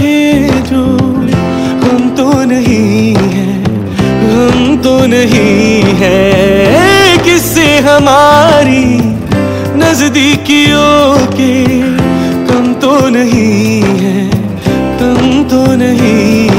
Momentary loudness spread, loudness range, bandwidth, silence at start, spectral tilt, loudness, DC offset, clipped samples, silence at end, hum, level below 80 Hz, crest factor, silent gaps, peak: 7 LU; 4 LU; 16.5 kHz; 0 s; -5.5 dB/octave; -8 LUFS; under 0.1%; 1%; 0 s; none; -30 dBFS; 8 dB; none; 0 dBFS